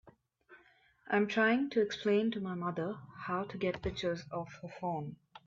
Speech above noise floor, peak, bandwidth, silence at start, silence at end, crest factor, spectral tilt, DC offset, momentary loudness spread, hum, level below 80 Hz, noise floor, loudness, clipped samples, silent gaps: 32 dB; -18 dBFS; 7.6 kHz; 0.05 s; 0.1 s; 18 dB; -6 dB/octave; under 0.1%; 13 LU; none; -62 dBFS; -66 dBFS; -34 LUFS; under 0.1%; none